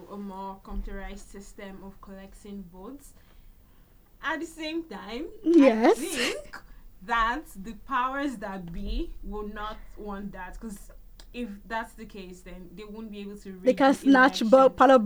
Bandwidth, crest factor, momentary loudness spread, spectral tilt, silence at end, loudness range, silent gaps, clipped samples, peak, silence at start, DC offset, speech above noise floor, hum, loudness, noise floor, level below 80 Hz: over 20 kHz; 22 dB; 25 LU; -4.5 dB/octave; 0 s; 16 LU; none; under 0.1%; -6 dBFS; 0 s; under 0.1%; 29 dB; none; -25 LUFS; -55 dBFS; -44 dBFS